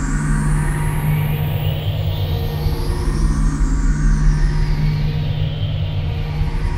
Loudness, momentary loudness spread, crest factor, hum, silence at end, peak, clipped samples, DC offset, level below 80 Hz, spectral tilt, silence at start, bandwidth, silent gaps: -20 LUFS; 3 LU; 12 dB; none; 0 s; -4 dBFS; under 0.1%; under 0.1%; -20 dBFS; -6.5 dB/octave; 0 s; 16 kHz; none